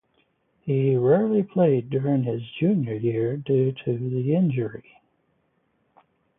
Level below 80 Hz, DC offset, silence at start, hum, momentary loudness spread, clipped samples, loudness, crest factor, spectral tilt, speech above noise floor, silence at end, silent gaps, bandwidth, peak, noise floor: -64 dBFS; under 0.1%; 0.65 s; none; 9 LU; under 0.1%; -23 LUFS; 16 dB; -13 dB/octave; 47 dB; 1.6 s; none; 3.8 kHz; -8 dBFS; -69 dBFS